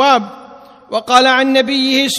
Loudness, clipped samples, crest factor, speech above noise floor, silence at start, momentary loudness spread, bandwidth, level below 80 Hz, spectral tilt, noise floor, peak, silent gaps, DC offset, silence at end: -12 LUFS; 0.2%; 14 dB; 26 dB; 0 s; 13 LU; 15.5 kHz; -60 dBFS; -2 dB/octave; -38 dBFS; 0 dBFS; none; under 0.1%; 0 s